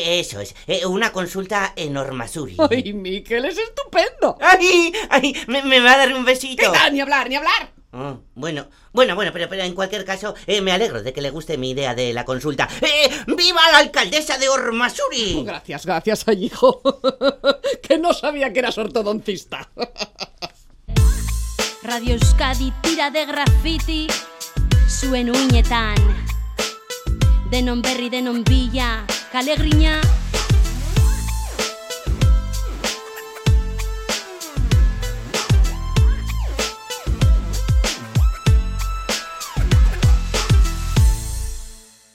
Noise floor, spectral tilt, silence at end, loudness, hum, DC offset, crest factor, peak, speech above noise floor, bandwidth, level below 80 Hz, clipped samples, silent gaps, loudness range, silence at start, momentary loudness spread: -40 dBFS; -4.5 dB/octave; 0.35 s; -19 LUFS; none; under 0.1%; 18 dB; 0 dBFS; 22 dB; 16 kHz; -22 dBFS; under 0.1%; none; 7 LU; 0 s; 12 LU